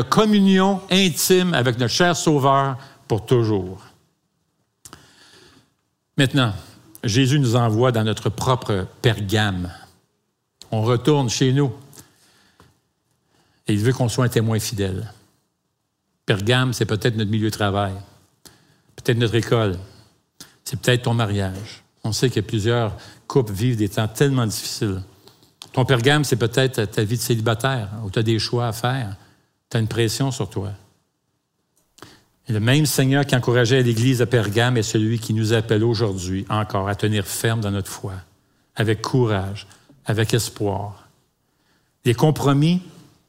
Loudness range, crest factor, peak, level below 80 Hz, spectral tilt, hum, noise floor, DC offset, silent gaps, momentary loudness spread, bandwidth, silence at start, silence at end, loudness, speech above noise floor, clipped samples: 6 LU; 20 dB; -2 dBFS; -54 dBFS; -5.5 dB/octave; none; -73 dBFS; under 0.1%; none; 13 LU; 16 kHz; 0 s; 0.35 s; -20 LUFS; 54 dB; under 0.1%